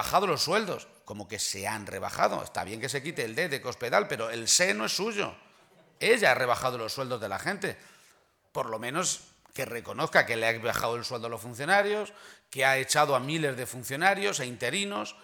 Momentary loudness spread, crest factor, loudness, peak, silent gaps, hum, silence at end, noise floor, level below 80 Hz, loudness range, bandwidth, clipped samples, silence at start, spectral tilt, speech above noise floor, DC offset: 12 LU; 22 dB; -28 LUFS; -8 dBFS; none; none; 0.1 s; -64 dBFS; -66 dBFS; 4 LU; over 20 kHz; under 0.1%; 0 s; -2.5 dB/octave; 35 dB; under 0.1%